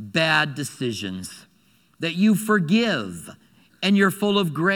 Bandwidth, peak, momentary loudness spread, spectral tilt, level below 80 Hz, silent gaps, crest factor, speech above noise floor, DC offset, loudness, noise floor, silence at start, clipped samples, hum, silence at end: 18 kHz; -4 dBFS; 14 LU; -5 dB/octave; -66 dBFS; none; 18 dB; 39 dB; under 0.1%; -21 LUFS; -60 dBFS; 0 s; under 0.1%; none; 0 s